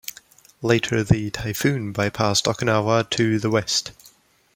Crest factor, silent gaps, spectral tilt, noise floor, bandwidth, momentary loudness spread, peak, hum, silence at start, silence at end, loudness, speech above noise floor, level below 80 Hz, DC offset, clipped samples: 20 dB; none; -4.5 dB/octave; -54 dBFS; 17 kHz; 6 LU; -2 dBFS; none; 0.05 s; 0.45 s; -21 LUFS; 33 dB; -46 dBFS; under 0.1%; under 0.1%